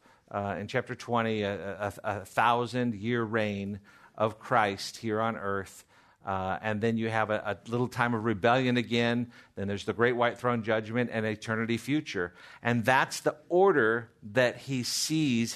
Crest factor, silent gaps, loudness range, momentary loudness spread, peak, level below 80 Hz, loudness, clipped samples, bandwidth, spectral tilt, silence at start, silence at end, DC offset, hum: 20 dB; none; 4 LU; 10 LU; -8 dBFS; -68 dBFS; -29 LUFS; under 0.1%; 13.5 kHz; -5 dB/octave; 0.3 s; 0 s; under 0.1%; none